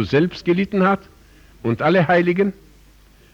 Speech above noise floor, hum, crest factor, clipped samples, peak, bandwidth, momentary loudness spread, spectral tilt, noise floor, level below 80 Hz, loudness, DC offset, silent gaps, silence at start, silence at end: 32 dB; 50 Hz at -45 dBFS; 14 dB; under 0.1%; -6 dBFS; 7.4 kHz; 9 LU; -8 dB/octave; -50 dBFS; -50 dBFS; -19 LUFS; under 0.1%; none; 0 s; 0.8 s